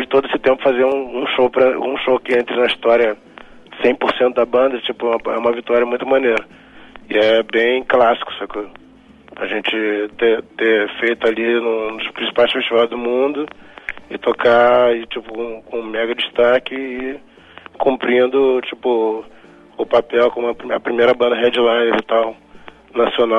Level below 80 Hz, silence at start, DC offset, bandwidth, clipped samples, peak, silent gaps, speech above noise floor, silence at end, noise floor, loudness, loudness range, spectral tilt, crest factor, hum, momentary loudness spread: -52 dBFS; 0 s; under 0.1%; 6.8 kHz; under 0.1%; -2 dBFS; none; 27 dB; 0 s; -43 dBFS; -17 LUFS; 2 LU; -5.5 dB/octave; 14 dB; none; 12 LU